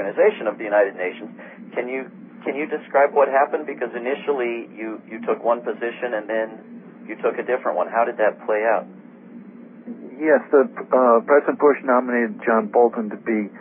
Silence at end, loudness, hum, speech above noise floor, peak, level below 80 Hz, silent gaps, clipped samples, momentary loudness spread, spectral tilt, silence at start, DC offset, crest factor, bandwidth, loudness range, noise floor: 0 s; -21 LUFS; none; 21 dB; -4 dBFS; -84 dBFS; none; under 0.1%; 20 LU; -10.5 dB/octave; 0 s; under 0.1%; 18 dB; 3.7 kHz; 7 LU; -41 dBFS